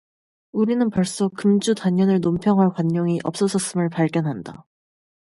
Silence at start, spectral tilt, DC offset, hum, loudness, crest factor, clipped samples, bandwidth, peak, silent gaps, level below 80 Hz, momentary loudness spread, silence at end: 0.55 s; -6.5 dB/octave; under 0.1%; none; -21 LUFS; 14 dB; under 0.1%; 11.5 kHz; -6 dBFS; none; -58 dBFS; 6 LU; 0.8 s